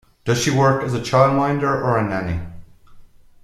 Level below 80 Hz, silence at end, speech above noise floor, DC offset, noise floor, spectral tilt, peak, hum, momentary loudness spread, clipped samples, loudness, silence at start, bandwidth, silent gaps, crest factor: -44 dBFS; 0.4 s; 25 dB; under 0.1%; -43 dBFS; -5.5 dB/octave; -2 dBFS; none; 10 LU; under 0.1%; -19 LUFS; 0.25 s; 13.5 kHz; none; 18 dB